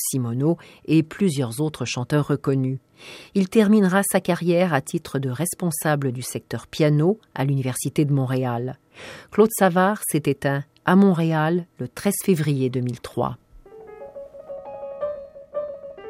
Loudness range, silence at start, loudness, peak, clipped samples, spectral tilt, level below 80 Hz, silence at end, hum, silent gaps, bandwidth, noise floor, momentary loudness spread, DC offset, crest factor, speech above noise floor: 6 LU; 0 s; -22 LUFS; -4 dBFS; under 0.1%; -6 dB/octave; -60 dBFS; 0 s; none; none; 16 kHz; -44 dBFS; 18 LU; under 0.1%; 18 dB; 22 dB